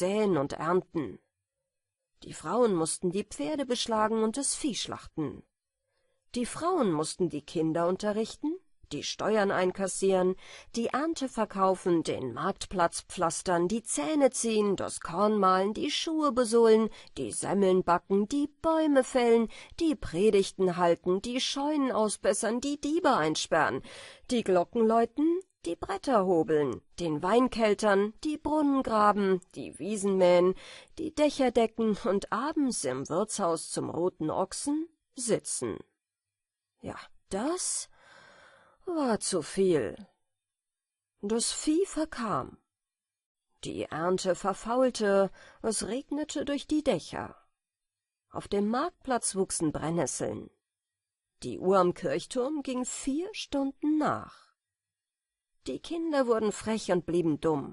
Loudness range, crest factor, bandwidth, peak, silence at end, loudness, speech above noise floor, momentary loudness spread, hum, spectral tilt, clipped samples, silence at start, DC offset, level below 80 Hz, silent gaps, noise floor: 7 LU; 18 dB; 11.5 kHz; -10 dBFS; 0 s; -29 LUFS; over 61 dB; 12 LU; none; -4.5 dB/octave; under 0.1%; 0 s; under 0.1%; -58 dBFS; 43.26-43.35 s; under -90 dBFS